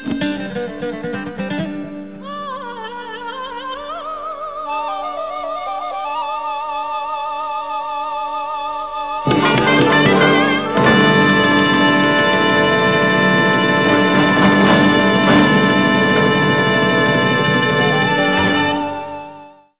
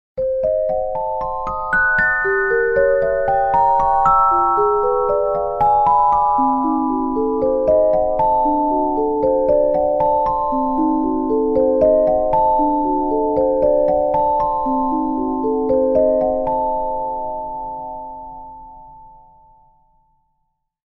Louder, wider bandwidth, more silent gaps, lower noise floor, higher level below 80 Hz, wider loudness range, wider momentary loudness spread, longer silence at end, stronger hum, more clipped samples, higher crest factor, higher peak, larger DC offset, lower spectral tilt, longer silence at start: about the same, -15 LUFS vs -17 LUFS; second, 4 kHz vs 5 kHz; neither; second, -40 dBFS vs -70 dBFS; second, -46 dBFS vs -40 dBFS; first, 13 LU vs 7 LU; first, 15 LU vs 9 LU; second, 0.3 s vs 1.8 s; first, 50 Hz at -40 dBFS vs none; neither; about the same, 14 dB vs 14 dB; about the same, -2 dBFS vs -2 dBFS; first, 0.5% vs under 0.1%; about the same, -9.5 dB/octave vs -9 dB/octave; second, 0 s vs 0.15 s